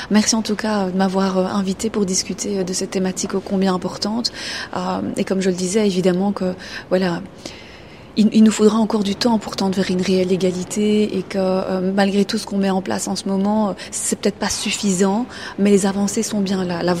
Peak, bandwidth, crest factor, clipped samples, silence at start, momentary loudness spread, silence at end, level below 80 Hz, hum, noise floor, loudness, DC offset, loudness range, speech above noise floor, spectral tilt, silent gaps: -2 dBFS; 14.5 kHz; 18 dB; under 0.1%; 0 s; 7 LU; 0 s; -50 dBFS; none; -39 dBFS; -19 LUFS; 0.2%; 3 LU; 21 dB; -5 dB/octave; none